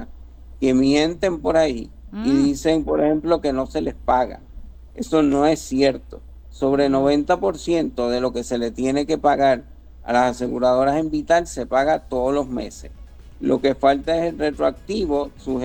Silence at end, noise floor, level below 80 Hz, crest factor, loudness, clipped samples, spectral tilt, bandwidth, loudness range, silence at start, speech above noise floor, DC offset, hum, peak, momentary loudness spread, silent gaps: 0 s; -39 dBFS; -40 dBFS; 16 dB; -20 LUFS; under 0.1%; -5.5 dB/octave; 19 kHz; 2 LU; 0 s; 19 dB; under 0.1%; none; -4 dBFS; 9 LU; none